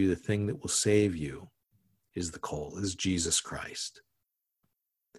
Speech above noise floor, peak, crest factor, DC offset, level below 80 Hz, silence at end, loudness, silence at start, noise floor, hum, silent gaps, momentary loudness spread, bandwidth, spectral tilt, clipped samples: 52 dB; -14 dBFS; 20 dB; under 0.1%; -52 dBFS; 1.3 s; -31 LUFS; 0 s; -83 dBFS; none; none; 13 LU; 13 kHz; -4 dB/octave; under 0.1%